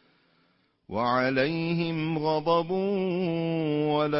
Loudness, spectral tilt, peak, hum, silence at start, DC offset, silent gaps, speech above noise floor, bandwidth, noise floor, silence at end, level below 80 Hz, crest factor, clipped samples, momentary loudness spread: -27 LUFS; -10.5 dB/octave; -12 dBFS; none; 0.9 s; under 0.1%; none; 42 dB; 5.8 kHz; -68 dBFS; 0 s; -64 dBFS; 16 dB; under 0.1%; 4 LU